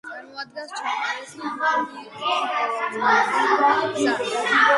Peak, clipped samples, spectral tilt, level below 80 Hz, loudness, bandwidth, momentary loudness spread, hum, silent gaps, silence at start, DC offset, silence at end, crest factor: -4 dBFS; under 0.1%; -2.5 dB/octave; -72 dBFS; -22 LUFS; 11.5 kHz; 14 LU; none; none; 0.05 s; under 0.1%; 0 s; 18 dB